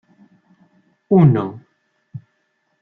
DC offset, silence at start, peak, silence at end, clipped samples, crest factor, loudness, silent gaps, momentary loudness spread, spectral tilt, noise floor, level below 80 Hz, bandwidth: under 0.1%; 1.1 s; -2 dBFS; 0.65 s; under 0.1%; 18 dB; -16 LUFS; none; 26 LU; -12 dB/octave; -68 dBFS; -58 dBFS; 3.9 kHz